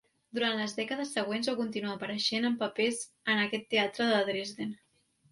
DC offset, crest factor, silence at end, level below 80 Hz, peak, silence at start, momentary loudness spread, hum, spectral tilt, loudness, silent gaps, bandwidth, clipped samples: under 0.1%; 18 dB; 0.55 s; -76 dBFS; -14 dBFS; 0.35 s; 8 LU; none; -3.5 dB/octave; -31 LUFS; none; 11.5 kHz; under 0.1%